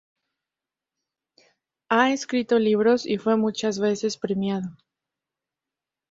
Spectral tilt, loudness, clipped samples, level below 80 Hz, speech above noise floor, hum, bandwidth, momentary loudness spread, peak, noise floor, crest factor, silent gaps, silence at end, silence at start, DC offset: -5 dB/octave; -23 LUFS; under 0.1%; -68 dBFS; 67 dB; none; 7.8 kHz; 7 LU; -4 dBFS; -89 dBFS; 22 dB; none; 1.4 s; 1.9 s; under 0.1%